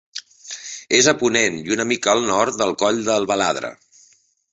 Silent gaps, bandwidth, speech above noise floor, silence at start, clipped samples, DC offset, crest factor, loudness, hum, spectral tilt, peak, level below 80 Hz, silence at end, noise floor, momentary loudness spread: none; 8.2 kHz; 38 dB; 0.15 s; under 0.1%; under 0.1%; 20 dB; -18 LUFS; none; -2.5 dB/octave; -2 dBFS; -58 dBFS; 0.8 s; -57 dBFS; 17 LU